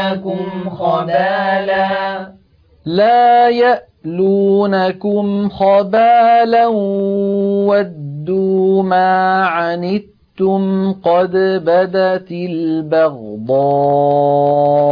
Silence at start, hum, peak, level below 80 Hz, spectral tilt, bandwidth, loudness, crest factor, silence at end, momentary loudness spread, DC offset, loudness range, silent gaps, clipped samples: 0 s; none; -2 dBFS; -56 dBFS; -9 dB/octave; 5.2 kHz; -14 LUFS; 12 dB; 0 s; 10 LU; under 0.1%; 3 LU; none; under 0.1%